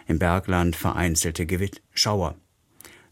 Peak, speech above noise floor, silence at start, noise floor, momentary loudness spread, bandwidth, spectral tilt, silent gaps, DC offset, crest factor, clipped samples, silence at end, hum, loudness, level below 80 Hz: -4 dBFS; 28 dB; 0.1 s; -51 dBFS; 6 LU; 16.5 kHz; -4 dB/octave; none; under 0.1%; 20 dB; under 0.1%; 0.25 s; none; -24 LUFS; -40 dBFS